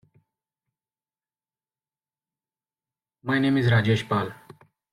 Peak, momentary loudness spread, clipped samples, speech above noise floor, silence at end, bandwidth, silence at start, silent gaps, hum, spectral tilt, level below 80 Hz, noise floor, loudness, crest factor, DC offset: -8 dBFS; 12 LU; under 0.1%; over 68 dB; 0.6 s; 11 kHz; 3.25 s; none; none; -7 dB/octave; -60 dBFS; under -90 dBFS; -23 LUFS; 20 dB; under 0.1%